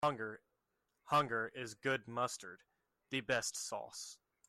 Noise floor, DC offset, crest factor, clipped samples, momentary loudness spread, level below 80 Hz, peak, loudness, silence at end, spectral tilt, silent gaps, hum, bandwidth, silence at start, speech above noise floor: -85 dBFS; under 0.1%; 20 dB; under 0.1%; 14 LU; -78 dBFS; -22 dBFS; -39 LUFS; 0.35 s; -3 dB/octave; none; none; 16 kHz; 0 s; 46 dB